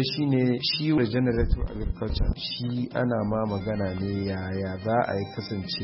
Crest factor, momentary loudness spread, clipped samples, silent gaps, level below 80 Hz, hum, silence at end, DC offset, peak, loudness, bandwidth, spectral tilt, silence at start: 16 dB; 7 LU; under 0.1%; none; -34 dBFS; none; 0 s; under 0.1%; -10 dBFS; -27 LUFS; 5.8 kHz; -10 dB/octave; 0 s